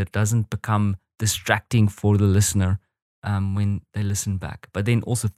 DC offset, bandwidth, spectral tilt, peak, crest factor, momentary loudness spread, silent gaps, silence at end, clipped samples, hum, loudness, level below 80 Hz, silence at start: under 0.1%; 15 kHz; -5 dB/octave; -2 dBFS; 20 dB; 9 LU; 3.02-3.22 s; 0.05 s; under 0.1%; none; -23 LUFS; -48 dBFS; 0 s